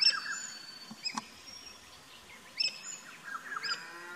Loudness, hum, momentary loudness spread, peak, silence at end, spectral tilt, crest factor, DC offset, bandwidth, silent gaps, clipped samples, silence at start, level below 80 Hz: -36 LUFS; none; 18 LU; -16 dBFS; 0 s; 1 dB/octave; 22 dB; under 0.1%; 15.5 kHz; none; under 0.1%; 0 s; -76 dBFS